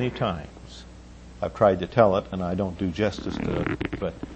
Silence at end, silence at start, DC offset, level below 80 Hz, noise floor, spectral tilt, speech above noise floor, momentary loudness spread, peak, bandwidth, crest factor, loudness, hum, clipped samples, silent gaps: 0 s; 0 s; under 0.1%; -44 dBFS; -44 dBFS; -7.5 dB/octave; 20 dB; 22 LU; -4 dBFS; 8.6 kHz; 22 dB; -25 LUFS; none; under 0.1%; none